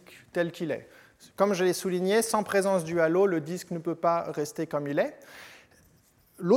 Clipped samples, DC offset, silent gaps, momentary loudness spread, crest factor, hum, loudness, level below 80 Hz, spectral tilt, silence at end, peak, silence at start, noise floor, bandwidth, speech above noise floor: under 0.1%; under 0.1%; none; 11 LU; 20 dB; none; -28 LUFS; -72 dBFS; -5 dB/octave; 0 s; -8 dBFS; 0.1 s; -62 dBFS; 16.5 kHz; 35 dB